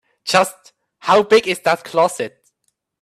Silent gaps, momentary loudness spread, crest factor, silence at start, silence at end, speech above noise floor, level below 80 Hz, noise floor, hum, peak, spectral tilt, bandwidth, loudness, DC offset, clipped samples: none; 15 LU; 18 dB; 0.25 s; 0.75 s; 54 dB; -64 dBFS; -70 dBFS; none; 0 dBFS; -3 dB/octave; 14.5 kHz; -17 LUFS; under 0.1%; under 0.1%